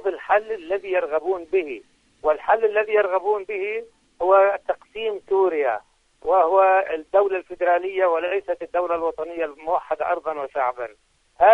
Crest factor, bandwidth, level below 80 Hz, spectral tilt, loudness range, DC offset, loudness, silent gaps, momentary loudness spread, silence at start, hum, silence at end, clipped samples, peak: 18 dB; 6.2 kHz; -60 dBFS; -5 dB/octave; 3 LU; under 0.1%; -22 LUFS; none; 11 LU; 0 s; none; 0 s; under 0.1%; -4 dBFS